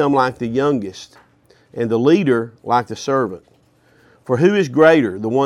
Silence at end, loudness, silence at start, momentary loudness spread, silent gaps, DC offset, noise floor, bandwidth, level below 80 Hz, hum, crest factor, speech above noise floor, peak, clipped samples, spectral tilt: 0 s; -17 LUFS; 0 s; 13 LU; none; under 0.1%; -54 dBFS; 11.5 kHz; -58 dBFS; none; 16 dB; 38 dB; 0 dBFS; under 0.1%; -6.5 dB/octave